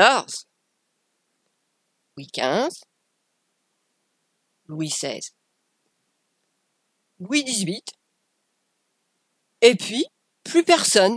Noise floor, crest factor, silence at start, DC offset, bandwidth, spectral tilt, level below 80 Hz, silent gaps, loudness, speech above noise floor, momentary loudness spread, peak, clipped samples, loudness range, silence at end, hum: -74 dBFS; 24 dB; 0 s; under 0.1%; 11 kHz; -2.5 dB/octave; -76 dBFS; none; -21 LUFS; 53 dB; 21 LU; 0 dBFS; under 0.1%; 10 LU; 0 s; none